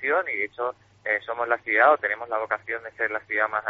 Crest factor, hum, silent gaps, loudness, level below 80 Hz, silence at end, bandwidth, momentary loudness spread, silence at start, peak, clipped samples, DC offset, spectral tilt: 20 dB; none; none; -25 LUFS; -70 dBFS; 0 s; 6 kHz; 12 LU; 0 s; -6 dBFS; under 0.1%; under 0.1%; -0.5 dB/octave